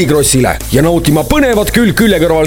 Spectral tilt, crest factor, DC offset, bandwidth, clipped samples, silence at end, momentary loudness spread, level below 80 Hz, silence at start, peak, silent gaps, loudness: -4.5 dB/octave; 10 dB; under 0.1%; over 20 kHz; 0.2%; 0 s; 2 LU; -24 dBFS; 0 s; 0 dBFS; none; -10 LUFS